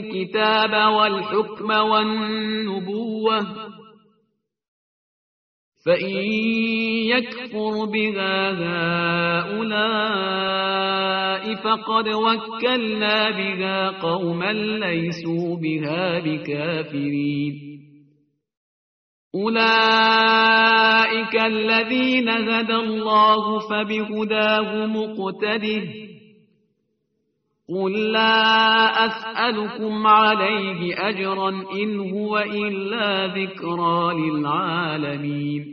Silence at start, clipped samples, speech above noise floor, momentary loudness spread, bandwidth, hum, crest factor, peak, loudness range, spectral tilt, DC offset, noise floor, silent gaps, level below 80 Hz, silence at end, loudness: 0 s; under 0.1%; 51 dB; 11 LU; 6.4 kHz; none; 18 dB; -2 dBFS; 9 LU; -2 dB/octave; under 0.1%; -72 dBFS; 4.68-5.72 s, 18.57-19.31 s; -66 dBFS; 0 s; -20 LUFS